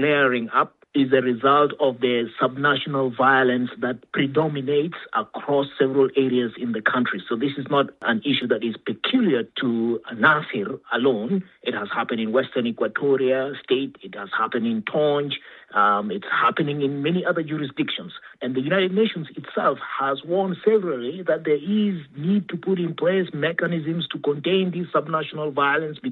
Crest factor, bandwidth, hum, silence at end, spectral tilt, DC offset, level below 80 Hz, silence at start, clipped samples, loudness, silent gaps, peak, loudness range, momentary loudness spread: 20 dB; 4.4 kHz; none; 0 s; -9 dB/octave; under 0.1%; -72 dBFS; 0 s; under 0.1%; -22 LUFS; none; -2 dBFS; 3 LU; 8 LU